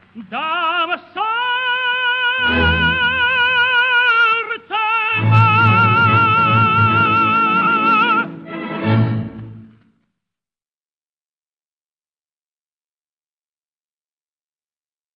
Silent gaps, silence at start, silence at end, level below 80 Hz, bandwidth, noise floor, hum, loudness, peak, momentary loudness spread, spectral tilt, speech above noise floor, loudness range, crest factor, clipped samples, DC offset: none; 0.15 s; 5.5 s; -44 dBFS; 5.8 kHz; under -90 dBFS; none; -14 LUFS; -2 dBFS; 10 LU; -7.5 dB/octave; over 69 dB; 12 LU; 16 dB; under 0.1%; under 0.1%